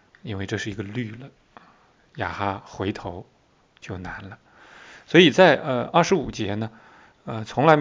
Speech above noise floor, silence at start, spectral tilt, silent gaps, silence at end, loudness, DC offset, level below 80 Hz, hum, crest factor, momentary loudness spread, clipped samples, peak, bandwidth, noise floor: 37 dB; 0.25 s; -5.5 dB/octave; none; 0 s; -22 LUFS; under 0.1%; -52 dBFS; none; 24 dB; 21 LU; under 0.1%; 0 dBFS; 7.6 kHz; -59 dBFS